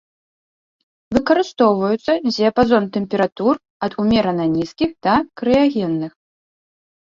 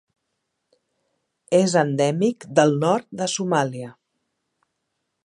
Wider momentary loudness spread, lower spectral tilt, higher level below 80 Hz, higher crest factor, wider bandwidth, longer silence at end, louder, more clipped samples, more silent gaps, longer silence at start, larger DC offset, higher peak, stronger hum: about the same, 7 LU vs 9 LU; first, -6.5 dB/octave vs -5 dB/octave; first, -48 dBFS vs -72 dBFS; second, 16 dB vs 22 dB; second, 7.4 kHz vs 11.5 kHz; second, 1.1 s vs 1.35 s; first, -18 LUFS vs -21 LUFS; neither; first, 3.32-3.36 s, 3.70-3.80 s vs none; second, 1.1 s vs 1.5 s; neither; about the same, -2 dBFS vs -2 dBFS; neither